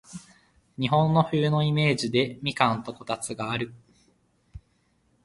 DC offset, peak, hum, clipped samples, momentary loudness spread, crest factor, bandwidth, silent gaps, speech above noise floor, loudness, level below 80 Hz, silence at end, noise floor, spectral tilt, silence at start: under 0.1%; -4 dBFS; none; under 0.1%; 13 LU; 24 dB; 11.5 kHz; none; 43 dB; -25 LUFS; -58 dBFS; 0.65 s; -68 dBFS; -5.5 dB/octave; 0.1 s